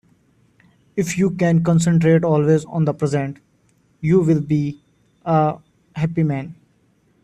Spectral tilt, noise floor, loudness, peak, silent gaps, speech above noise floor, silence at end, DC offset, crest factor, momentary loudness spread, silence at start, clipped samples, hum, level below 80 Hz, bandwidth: -7.5 dB/octave; -60 dBFS; -19 LUFS; -4 dBFS; none; 43 dB; 0.7 s; under 0.1%; 16 dB; 13 LU; 0.95 s; under 0.1%; none; -54 dBFS; 10.5 kHz